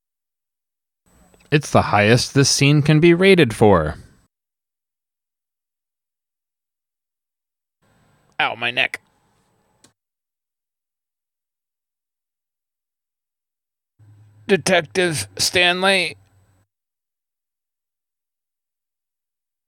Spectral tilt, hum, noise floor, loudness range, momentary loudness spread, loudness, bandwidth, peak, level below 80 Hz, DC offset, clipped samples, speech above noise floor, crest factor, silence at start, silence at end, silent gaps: -4.5 dB/octave; none; under -90 dBFS; 12 LU; 9 LU; -16 LUFS; 17 kHz; -2 dBFS; -52 dBFS; under 0.1%; under 0.1%; over 74 dB; 20 dB; 1.5 s; 3.55 s; none